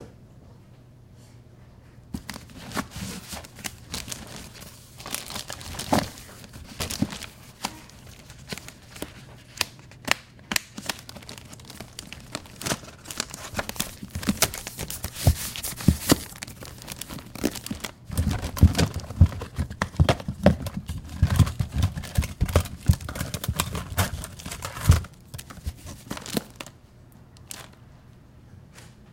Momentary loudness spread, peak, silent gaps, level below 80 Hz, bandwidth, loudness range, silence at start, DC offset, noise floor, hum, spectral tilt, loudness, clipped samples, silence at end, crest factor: 19 LU; 0 dBFS; none; -36 dBFS; 17 kHz; 12 LU; 0 s; under 0.1%; -50 dBFS; none; -4.5 dB/octave; -28 LUFS; under 0.1%; 0 s; 28 dB